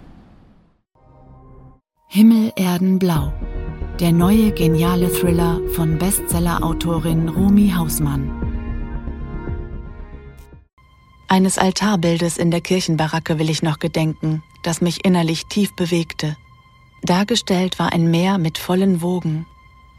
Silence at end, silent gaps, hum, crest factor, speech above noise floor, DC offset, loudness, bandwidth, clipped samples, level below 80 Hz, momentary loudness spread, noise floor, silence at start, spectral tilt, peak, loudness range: 0.55 s; 10.73-10.77 s; none; 18 dB; 38 dB; under 0.1%; -18 LUFS; 17 kHz; under 0.1%; -32 dBFS; 14 LU; -55 dBFS; 1.3 s; -5.5 dB/octave; 0 dBFS; 4 LU